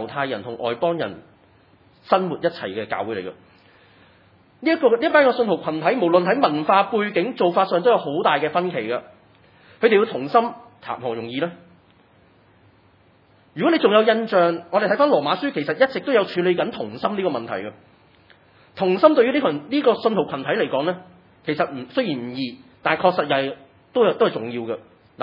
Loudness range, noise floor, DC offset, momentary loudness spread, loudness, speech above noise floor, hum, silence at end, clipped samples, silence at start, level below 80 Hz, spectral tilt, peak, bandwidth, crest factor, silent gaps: 7 LU; -56 dBFS; under 0.1%; 13 LU; -21 LUFS; 36 dB; none; 0 s; under 0.1%; 0 s; -70 dBFS; -8.5 dB/octave; 0 dBFS; 5.6 kHz; 22 dB; none